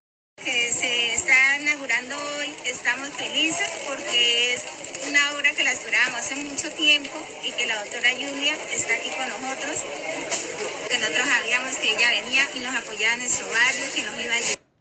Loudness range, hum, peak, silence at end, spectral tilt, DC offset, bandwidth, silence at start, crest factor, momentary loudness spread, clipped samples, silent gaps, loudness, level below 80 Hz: 4 LU; none; -4 dBFS; 0.25 s; 0.5 dB/octave; under 0.1%; 9.4 kHz; 0.4 s; 20 dB; 11 LU; under 0.1%; none; -22 LUFS; -66 dBFS